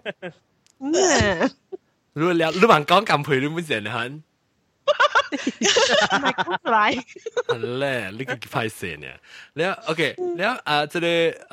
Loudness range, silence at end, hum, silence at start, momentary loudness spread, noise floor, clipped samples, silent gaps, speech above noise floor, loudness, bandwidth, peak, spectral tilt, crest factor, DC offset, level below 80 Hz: 6 LU; 0.1 s; none; 0.05 s; 16 LU; -68 dBFS; under 0.1%; none; 46 dB; -21 LUFS; 16 kHz; 0 dBFS; -3.5 dB/octave; 22 dB; under 0.1%; -52 dBFS